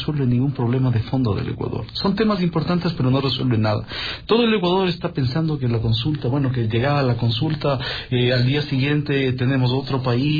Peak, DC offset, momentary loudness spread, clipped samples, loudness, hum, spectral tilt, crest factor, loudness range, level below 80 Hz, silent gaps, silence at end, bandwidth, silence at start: -6 dBFS; under 0.1%; 5 LU; under 0.1%; -21 LUFS; none; -8.5 dB/octave; 14 dB; 1 LU; -42 dBFS; none; 0 s; 5 kHz; 0 s